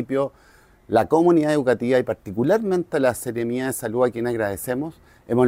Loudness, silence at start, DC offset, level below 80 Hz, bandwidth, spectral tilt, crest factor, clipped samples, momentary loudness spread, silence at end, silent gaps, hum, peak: -22 LUFS; 0 s; under 0.1%; -56 dBFS; 16 kHz; -6 dB/octave; 16 dB; under 0.1%; 10 LU; 0 s; none; none; -6 dBFS